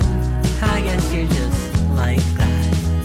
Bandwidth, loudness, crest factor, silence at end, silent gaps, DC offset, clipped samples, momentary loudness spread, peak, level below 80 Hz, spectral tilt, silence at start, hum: 16 kHz; -19 LUFS; 10 dB; 0 s; none; under 0.1%; under 0.1%; 2 LU; -8 dBFS; -22 dBFS; -6 dB/octave; 0 s; none